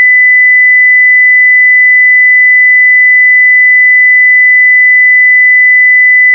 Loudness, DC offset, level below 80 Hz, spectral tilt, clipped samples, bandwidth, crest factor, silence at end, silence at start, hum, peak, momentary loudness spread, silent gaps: -1 LUFS; under 0.1%; under -90 dBFS; 2.5 dB/octave; under 0.1%; 2.2 kHz; 4 dB; 0 s; 0 s; none; 0 dBFS; 0 LU; none